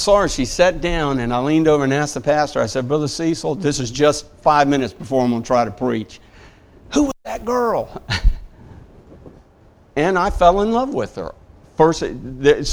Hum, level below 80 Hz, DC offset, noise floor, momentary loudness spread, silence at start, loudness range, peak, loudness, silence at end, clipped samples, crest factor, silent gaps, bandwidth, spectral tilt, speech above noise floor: none; -30 dBFS; under 0.1%; -50 dBFS; 10 LU; 0 s; 5 LU; 0 dBFS; -18 LUFS; 0 s; under 0.1%; 18 dB; none; 16 kHz; -5 dB/octave; 32 dB